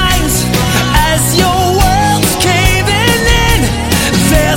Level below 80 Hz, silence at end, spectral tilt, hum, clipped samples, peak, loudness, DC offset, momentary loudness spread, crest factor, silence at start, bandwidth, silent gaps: -18 dBFS; 0 s; -4 dB/octave; none; under 0.1%; 0 dBFS; -10 LUFS; under 0.1%; 2 LU; 10 dB; 0 s; 17 kHz; none